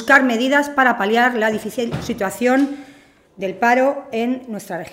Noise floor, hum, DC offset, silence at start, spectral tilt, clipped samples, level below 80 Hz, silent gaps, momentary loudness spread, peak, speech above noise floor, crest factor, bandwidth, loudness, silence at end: -48 dBFS; none; under 0.1%; 0 s; -4.5 dB/octave; under 0.1%; -54 dBFS; none; 13 LU; 0 dBFS; 30 dB; 18 dB; 16 kHz; -18 LUFS; 0.05 s